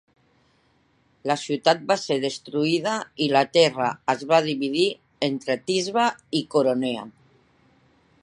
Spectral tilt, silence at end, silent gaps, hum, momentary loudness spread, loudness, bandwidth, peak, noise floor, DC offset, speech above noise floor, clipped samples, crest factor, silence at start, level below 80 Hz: -4.5 dB/octave; 1.15 s; none; none; 8 LU; -23 LUFS; 11.5 kHz; -4 dBFS; -64 dBFS; under 0.1%; 41 dB; under 0.1%; 20 dB; 1.25 s; -70 dBFS